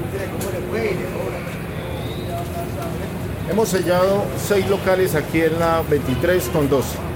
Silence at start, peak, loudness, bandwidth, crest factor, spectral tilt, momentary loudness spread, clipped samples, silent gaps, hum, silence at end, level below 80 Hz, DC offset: 0 s; -6 dBFS; -21 LUFS; 17 kHz; 16 dB; -5.5 dB/octave; 9 LU; under 0.1%; none; none; 0 s; -38 dBFS; under 0.1%